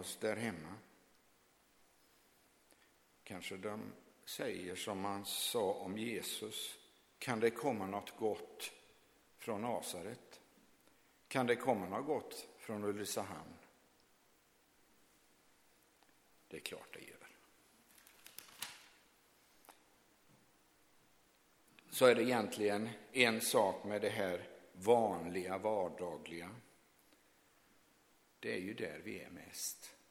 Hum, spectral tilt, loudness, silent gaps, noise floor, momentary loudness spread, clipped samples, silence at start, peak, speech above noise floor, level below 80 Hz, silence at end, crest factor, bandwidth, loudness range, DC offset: none; -3.5 dB/octave; -39 LUFS; none; -72 dBFS; 21 LU; under 0.1%; 0 s; -12 dBFS; 33 dB; -82 dBFS; 0.15 s; 28 dB; 18.5 kHz; 20 LU; under 0.1%